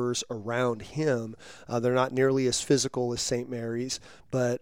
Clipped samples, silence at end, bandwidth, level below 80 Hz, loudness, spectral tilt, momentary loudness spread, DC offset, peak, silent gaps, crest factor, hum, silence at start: under 0.1%; 0.05 s; 16.5 kHz; -60 dBFS; -28 LUFS; -4.5 dB/octave; 9 LU; 0.2%; -10 dBFS; none; 18 dB; none; 0 s